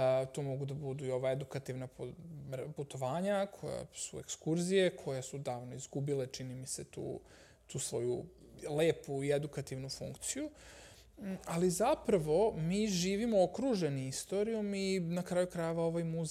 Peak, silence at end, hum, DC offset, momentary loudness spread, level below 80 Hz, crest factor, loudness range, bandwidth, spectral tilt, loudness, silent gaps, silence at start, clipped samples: -18 dBFS; 0 s; none; under 0.1%; 13 LU; -64 dBFS; 18 dB; 7 LU; 15.5 kHz; -5.5 dB/octave; -36 LUFS; none; 0 s; under 0.1%